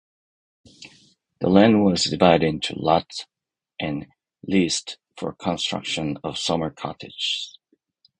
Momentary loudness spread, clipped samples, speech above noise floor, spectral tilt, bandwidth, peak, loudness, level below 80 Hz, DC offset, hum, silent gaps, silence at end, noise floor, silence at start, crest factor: 17 LU; under 0.1%; 42 dB; -5 dB/octave; 10 kHz; 0 dBFS; -22 LUFS; -52 dBFS; under 0.1%; none; none; 0.7 s; -64 dBFS; 0.8 s; 24 dB